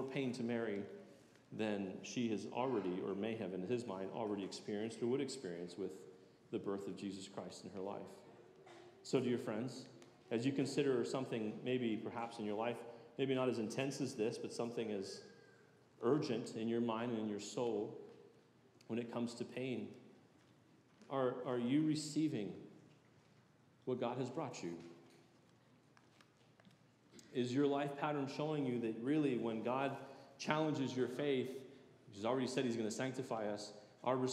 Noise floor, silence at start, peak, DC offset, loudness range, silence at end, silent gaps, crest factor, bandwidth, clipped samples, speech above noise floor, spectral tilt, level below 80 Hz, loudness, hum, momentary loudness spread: -69 dBFS; 0 s; -18 dBFS; under 0.1%; 8 LU; 0 s; none; 24 dB; 13.5 kHz; under 0.1%; 29 dB; -5.5 dB/octave; under -90 dBFS; -41 LUFS; none; 16 LU